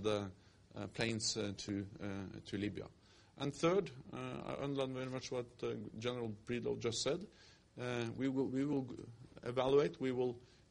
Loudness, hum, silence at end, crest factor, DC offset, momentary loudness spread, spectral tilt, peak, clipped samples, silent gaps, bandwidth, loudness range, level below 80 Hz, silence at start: -40 LUFS; none; 0.25 s; 20 dB; under 0.1%; 14 LU; -5 dB/octave; -20 dBFS; under 0.1%; none; 11 kHz; 3 LU; -68 dBFS; 0 s